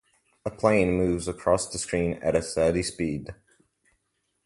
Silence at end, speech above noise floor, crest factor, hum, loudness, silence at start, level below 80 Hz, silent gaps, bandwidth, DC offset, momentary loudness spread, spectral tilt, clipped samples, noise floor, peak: 1.1 s; 51 dB; 20 dB; none; -26 LUFS; 0.45 s; -46 dBFS; none; 11.5 kHz; under 0.1%; 13 LU; -5 dB/octave; under 0.1%; -76 dBFS; -6 dBFS